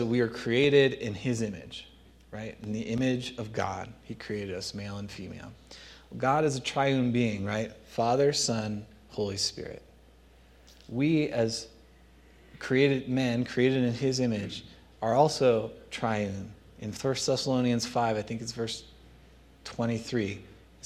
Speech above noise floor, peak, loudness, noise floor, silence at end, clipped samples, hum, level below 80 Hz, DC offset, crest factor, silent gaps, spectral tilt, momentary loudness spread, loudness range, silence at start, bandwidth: 28 dB; -8 dBFS; -29 LUFS; -57 dBFS; 0.3 s; under 0.1%; none; -58 dBFS; under 0.1%; 20 dB; none; -5 dB/octave; 17 LU; 6 LU; 0 s; 13.5 kHz